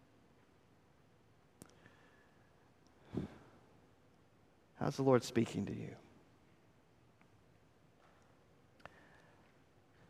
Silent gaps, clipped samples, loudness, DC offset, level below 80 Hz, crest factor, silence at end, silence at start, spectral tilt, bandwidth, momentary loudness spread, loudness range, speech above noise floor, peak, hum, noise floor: none; under 0.1%; -38 LUFS; under 0.1%; -74 dBFS; 28 dB; 4.1 s; 3.15 s; -6.5 dB/octave; 15 kHz; 31 LU; 15 LU; 34 dB; -16 dBFS; none; -69 dBFS